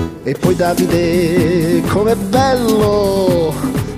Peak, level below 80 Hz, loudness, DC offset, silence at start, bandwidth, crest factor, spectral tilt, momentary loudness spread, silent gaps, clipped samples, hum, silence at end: 0 dBFS; -34 dBFS; -14 LUFS; under 0.1%; 0 s; 16 kHz; 14 dB; -6 dB/octave; 4 LU; none; under 0.1%; none; 0 s